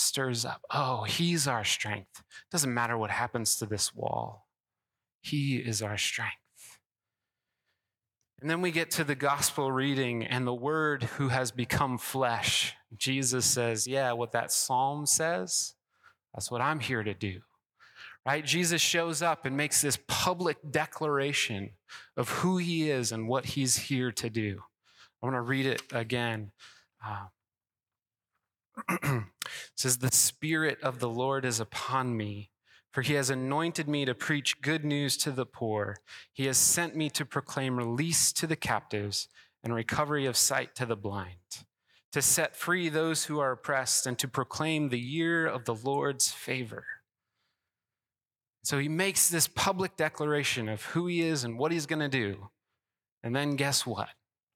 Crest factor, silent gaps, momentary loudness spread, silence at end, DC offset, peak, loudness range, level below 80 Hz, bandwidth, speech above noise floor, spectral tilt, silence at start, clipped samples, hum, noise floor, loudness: 20 dB; 5.15-5.20 s, 6.86-6.90 s, 42.04-42.12 s, 53.12-53.17 s; 13 LU; 0.45 s; under 0.1%; -12 dBFS; 6 LU; -66 dBFS; 18 kHz; over 60 dB; -3 dB/octave; 0 s; under 0.1%; none; under -90 dBFS; -29 LUFS